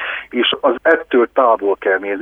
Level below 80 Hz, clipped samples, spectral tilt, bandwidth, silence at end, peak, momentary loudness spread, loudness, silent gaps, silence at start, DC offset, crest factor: -56 dBFS; under 0.1%; -5.5 dB/octave; 4 kHz; 0 s; 0 dBFS; 4 LU; -15 LUFS; none; 0 s; under 0.1%; 16 dB